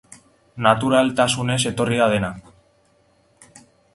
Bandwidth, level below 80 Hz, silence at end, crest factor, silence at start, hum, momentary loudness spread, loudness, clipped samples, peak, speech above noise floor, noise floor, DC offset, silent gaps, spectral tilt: 11.5 kHz; -52 dBFS; 1.55 s; 22 dB; 0.55 s; none; 7 LU; -19 LUFS; under 0.1%; 0 dBFS; 41 dB; -60 dBFS; under 0.1%; none; -4.5 dB/octave